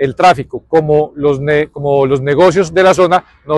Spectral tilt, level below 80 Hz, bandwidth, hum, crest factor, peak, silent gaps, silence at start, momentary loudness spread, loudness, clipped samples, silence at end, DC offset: -6 dB/octave; -42 dBFS; 12 kHz; none; 12 dB; 0 dBFS; none; 0 s; 5 LU; -12 LUFS; under 0.1%; 0 s; under 0.1%